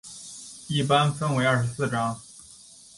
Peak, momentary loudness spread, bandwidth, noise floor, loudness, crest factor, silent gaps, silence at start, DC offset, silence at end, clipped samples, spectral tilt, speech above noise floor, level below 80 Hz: -8 dBFS; 23 LU; 11.5 kHz; -50 dBFS; -24 LUFS; 18 dB; none; 0.05 s; under 0.1%; 0.4 s; under 0.1%; -5 dB/octave; 26 dB; -58 dBFS